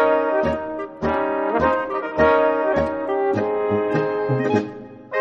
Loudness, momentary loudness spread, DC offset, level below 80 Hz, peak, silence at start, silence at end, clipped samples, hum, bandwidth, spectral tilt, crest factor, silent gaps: -21 LUFS; 9 LU; under 0.1%; -46 dBFS; -4 dBFS; 0 s; 0 s; under 0.1%; none; 7.4 kHz; -8 dB/octave; 18 dB; none